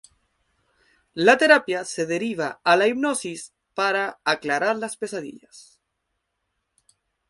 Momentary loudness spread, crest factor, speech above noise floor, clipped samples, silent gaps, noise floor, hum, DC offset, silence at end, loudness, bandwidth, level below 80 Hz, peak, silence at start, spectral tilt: 17 LU; 24 dB; 55 dB; under 0.1%; none; -77 dBFS; none; under 0.1%; 1.7 s; -21 LUFS; 11.5 kHz; -70 dBFS; 0 dBFS; 1.15 s; -3.5 dB/octave